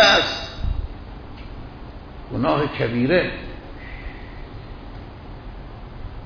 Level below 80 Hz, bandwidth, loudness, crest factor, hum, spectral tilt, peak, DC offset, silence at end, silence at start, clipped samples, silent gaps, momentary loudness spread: -34 dBFS; 5.4 kHz; -21 LUFS; 22 dB; none; -4.5 dB/octave; -2 dBFS; under 0.1%; 0 s; 0 s; under 0.1%; none; 20 LU